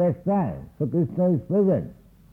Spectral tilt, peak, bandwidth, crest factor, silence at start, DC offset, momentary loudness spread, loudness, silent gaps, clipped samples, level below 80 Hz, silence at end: -12 dB/octave; -12 dBFS; 3 kHz; 12 dB; 0 s; under 0.1%; 9 LU; -24 LUFS; none; under 0.1%; -52 dBFS; 0.4 s